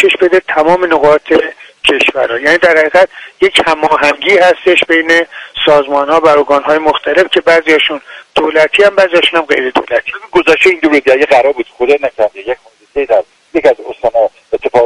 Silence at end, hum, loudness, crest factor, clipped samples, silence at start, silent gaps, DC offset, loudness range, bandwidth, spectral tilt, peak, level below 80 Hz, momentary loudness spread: 0 s; none; -9 LUFS; 10 dB; 0.6%; 0 s; none; under 0.1%; 2 LU; 11.5 kHz; -3.5 dB/octave; 0 dBFS; -46 dBFS; 8 LU